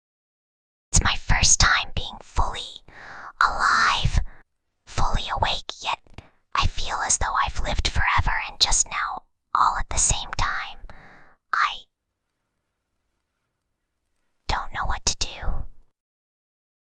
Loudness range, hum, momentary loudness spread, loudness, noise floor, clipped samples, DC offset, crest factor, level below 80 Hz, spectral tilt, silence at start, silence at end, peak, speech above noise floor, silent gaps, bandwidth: 10 LU; none; 15 LU; -23 LUFS; -79 dBFS; under 0.1%; under 0.1%; 22 dB; -30 dBFS; -1.5 dB/octave; 0.9 s; 1.1 s; -4 dBFS; 58 dB; none; 10 kHz